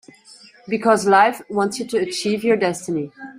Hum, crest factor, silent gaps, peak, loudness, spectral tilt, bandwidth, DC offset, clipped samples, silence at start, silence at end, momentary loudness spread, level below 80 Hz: none; 18 dB; none; -2 dBFS; -19 LUFS; -4.5 dB/octave; 16 kHz; under 0.1%; under 0.1%; 0.65 s; 0 s; 11 LU; -64 dBFS